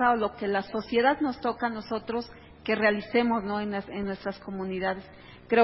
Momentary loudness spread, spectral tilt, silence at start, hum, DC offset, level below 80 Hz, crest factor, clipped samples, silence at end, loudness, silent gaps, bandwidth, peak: 11 LU; -9.5 dB/octave; 0 s; none; under 0.1%; -56 dBFS; 20 dB; under 0.1%; 0 s; -29 LUFS; none; 5.8 kHz; -8 dBFS